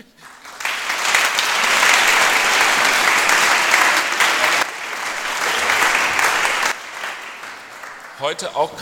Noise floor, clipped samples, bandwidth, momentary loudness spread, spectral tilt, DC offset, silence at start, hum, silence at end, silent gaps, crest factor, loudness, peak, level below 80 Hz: -41 dBFS; under 0.1%; 19 kHz; 15 LU; 0.5 dB/octave; under 0.1%; 0.25 s; none; 0 s; none; 18 dB; -15 LUFS; 0 dBFS; -56 dBFS